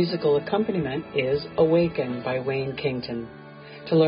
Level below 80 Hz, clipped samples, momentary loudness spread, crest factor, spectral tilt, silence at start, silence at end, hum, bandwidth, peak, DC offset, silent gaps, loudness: -54 dBFS; under 0.1%; 16 LU; 16 dB; -11 dB/octave; 0 s; 0 s; none; 5.4 kHz; -8 dBFS; under 0.1%; none; -25 LUFS